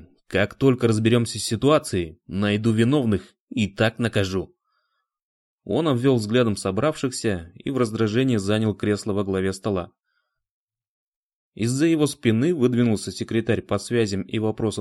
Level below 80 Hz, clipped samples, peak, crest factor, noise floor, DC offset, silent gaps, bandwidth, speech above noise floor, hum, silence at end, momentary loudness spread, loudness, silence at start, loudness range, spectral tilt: -54 dBFS; under 0.1%; -4 dBFS; 18 dB; -75 dBFS; under 0.1%; 3.40-3.48 s, 5.23-5.58 s, 10.51-10.68 s, 10.88-11.52 s; 12.5 kHz; 53 dB; none; 0 s; 8 LU; -23 LUFS; 0.3 s; 4 LU; -6 dB/octave